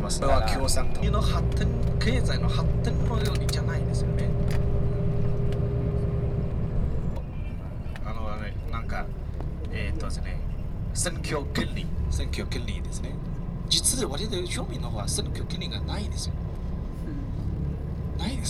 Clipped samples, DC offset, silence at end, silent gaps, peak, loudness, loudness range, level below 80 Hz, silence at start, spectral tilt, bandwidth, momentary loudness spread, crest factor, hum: under 0.1%; under 0.1%; 0 s; none; -8 dBFS; -29 LUFS; 7 LU; -30 dBFS; 0 s; -5 dB/octave; 14 kHz; 9 LU; 18 dB; none